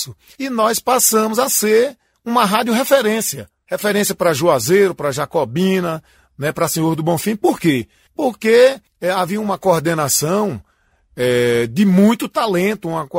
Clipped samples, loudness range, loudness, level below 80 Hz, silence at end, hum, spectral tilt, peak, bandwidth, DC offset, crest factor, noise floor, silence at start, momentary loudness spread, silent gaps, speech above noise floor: under 0.1%; 2 LU; -16 LUFS; -54 dBFS; 0 s; none; -4.5 dB/octave; 0 dBFS; 16.5 kHz; under 0.1%; 16 dB; -58 dBFS; 0 s; 11 LU; none; 41 dB